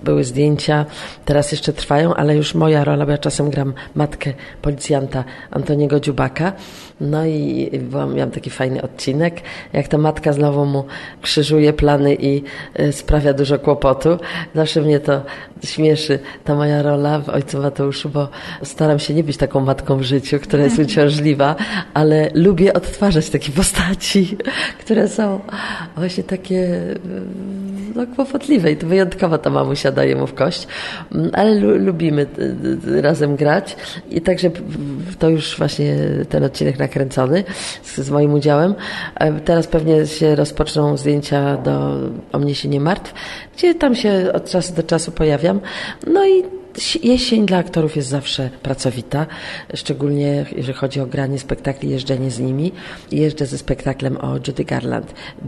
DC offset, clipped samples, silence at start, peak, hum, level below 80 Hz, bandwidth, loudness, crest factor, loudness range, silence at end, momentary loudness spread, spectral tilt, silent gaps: under 0.1%; under 0.1%; 0 s; -2 dBFS; none; -36 dBFS; 12.5 kHz; -17 LUFS; 16 dB; 5 LU; 0 s; 10 LU; -6 dB/octave; none